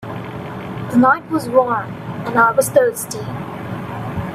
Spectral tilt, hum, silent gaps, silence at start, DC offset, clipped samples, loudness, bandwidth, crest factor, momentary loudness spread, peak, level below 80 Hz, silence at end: -5.5 dB/octave; none; none; 0 s; under 0.1%; under 0.1%; -18 LUFS; 16 kHz; 18 dB; 14 LU; 0 dBFS; -50 dBFS; 0 s